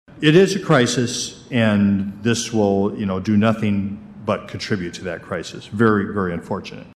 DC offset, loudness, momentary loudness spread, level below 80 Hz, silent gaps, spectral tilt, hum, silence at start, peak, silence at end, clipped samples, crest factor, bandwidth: under 0.1%; -20 LUFS; 13 LU; -52 dBFS; none; -5.5 dB/octave; none; 0.15 s; -2 dBFS; 0.05 s; under 0.1%; 18 dB; 13 kHz